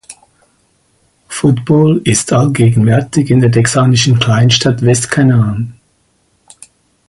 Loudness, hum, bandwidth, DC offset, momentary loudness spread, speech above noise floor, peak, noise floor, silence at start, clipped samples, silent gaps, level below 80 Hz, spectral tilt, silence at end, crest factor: -11 LUFS; none; 11.5 kHz; under 0.1%; 5 LU; 47 dB; 0 dBFS; -57 dBFS; 0.1 s; under 0.1%; none; -42 dBFS; -5.5 dB/octave; 1.35 s; 12 dB